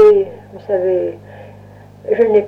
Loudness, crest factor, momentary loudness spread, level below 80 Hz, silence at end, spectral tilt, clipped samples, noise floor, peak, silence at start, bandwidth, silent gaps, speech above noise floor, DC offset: -16 LUFS; 12 dB; 24 LU; -54 dBFS; 0 s; -8 dB/octave; under 0.1%; -39 dBFS; -2 dBFS; 0 s; 4.9 kHz; none; 24 dB; under 0.1%